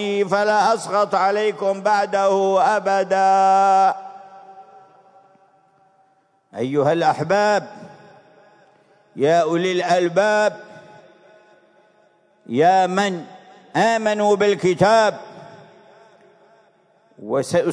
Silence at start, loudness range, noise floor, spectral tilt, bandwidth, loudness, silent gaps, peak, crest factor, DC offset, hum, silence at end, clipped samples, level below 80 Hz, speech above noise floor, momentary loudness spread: 0 s; 5 LU; -61 dBFS; -5 dB/octave; 11 kHz; -18 LUFS; none; -4 dBFS; 16 dB; under 0.1%; none; 0 s; under 0.1%; -68 dBFS; 43 dB; 11 LU